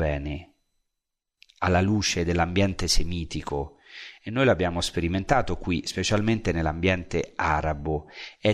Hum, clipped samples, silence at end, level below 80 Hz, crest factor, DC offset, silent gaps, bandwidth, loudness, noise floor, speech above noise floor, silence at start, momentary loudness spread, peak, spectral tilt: none; under 0.1%; 0 s; -36 dBFS; 20 dB; under 0.1%; none; 13.5 kHz; -26 LUFS; -83 dBFS; 58 dB; 0 s; 10 LU; -6 dBFS; -5 dB/octave